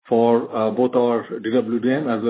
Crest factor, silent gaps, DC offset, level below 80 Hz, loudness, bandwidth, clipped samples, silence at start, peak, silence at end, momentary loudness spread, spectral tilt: 14 dB; none; under 0.1%; -68 dBFS; -20 LUFS; 4 kHz; under 0.1%; 0.05 s; -6 dBFS; 0 s; 5 LU; -11 dB/octave